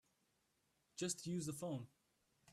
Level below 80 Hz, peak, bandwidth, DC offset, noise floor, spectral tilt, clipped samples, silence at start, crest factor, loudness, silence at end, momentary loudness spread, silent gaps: -82 dBFS; -28 dBFS; 14.5 kHz; under 0.1%; -83 dBFS; -4.5 dB/octave; under 0.1%; 0.95 s; 20 dB; -46 LUFS; 0 s; 13 LU; none